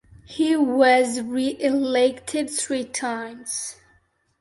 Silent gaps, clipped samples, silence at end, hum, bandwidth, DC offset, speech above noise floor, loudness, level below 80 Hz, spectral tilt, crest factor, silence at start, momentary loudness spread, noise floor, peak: none; under 0.1%; 0.7 s; none; 12 kHz; under 0.1%; 41 dB; -22 LUFS; -62 dBFS; -2.5 dB/octave; 18 dB; 0.3 s; 12 LU; -63 dBFS; -4 dBFS